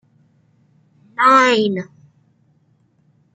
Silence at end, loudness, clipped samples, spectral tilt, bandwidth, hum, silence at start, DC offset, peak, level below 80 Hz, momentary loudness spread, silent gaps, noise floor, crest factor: 1.5 s; -14 LUFS; under 0.1%; -4 dB/octave; 9.4 kHz; none; 1.2 s; under 0.1%; -2 dBFS; -72 dBFS; 22 LU; none; -59 dBFS; 18 dB